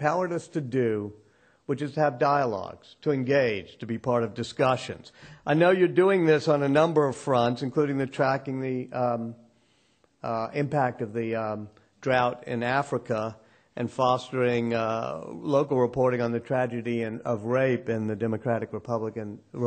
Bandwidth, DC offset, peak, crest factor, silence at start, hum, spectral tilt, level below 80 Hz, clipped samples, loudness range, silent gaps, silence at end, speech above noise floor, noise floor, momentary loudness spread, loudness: 9 kHz; under 0.1%; -8 dBFS; 18 dB; 0 s; none; -7 dB/octave; -64 dBFS; under 0.1%; 6 LU; none; 0 s; 40 dB; -66 dBFS; 13 LU; -26 LUFS